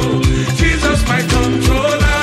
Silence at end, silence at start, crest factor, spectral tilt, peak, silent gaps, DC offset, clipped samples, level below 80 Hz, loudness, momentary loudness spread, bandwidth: 0 s; 0 s; 10 dB; -5 dB/octave; -2 dBFS; none; under 0.1%; under 0.1%; -18 dBFS; -14 LUFS; 1 LU; 15 kHz